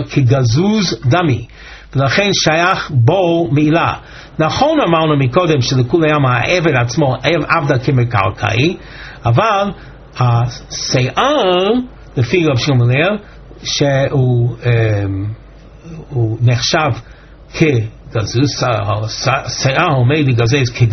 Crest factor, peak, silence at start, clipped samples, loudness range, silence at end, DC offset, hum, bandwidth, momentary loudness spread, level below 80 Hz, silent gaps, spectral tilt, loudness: 14 dB; 0 dBFS; 0 s; under 0.1%; 3 LU; 0 s; under 0.1%; none; 6.4 kHz; 9 LU; -38 dBFS; none; -5 dB/octave; -14 LUFS